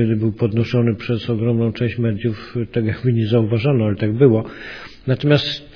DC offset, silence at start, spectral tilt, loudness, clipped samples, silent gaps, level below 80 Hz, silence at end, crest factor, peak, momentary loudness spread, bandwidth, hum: under 0.1%; 0 s; -8.5 dB/octave; -18 LUFS; under 0.1%; none; -48 dBFS; 0.1 s; 18 dB; 0 dBFS; 8 LU; 5.4 kHz; none